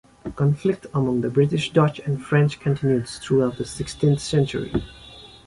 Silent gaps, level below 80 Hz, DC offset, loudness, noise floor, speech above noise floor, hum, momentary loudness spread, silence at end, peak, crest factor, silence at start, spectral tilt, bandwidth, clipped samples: none; -46 dBFS; under 0.1%; -22 LUFS; -44 dBFS; 23 dB; none; 10 LU; 0.2 s; -6 dBFS; 16 dB; 0.25 s; -7 dB/octave; 11.5 kHz; under 0.1%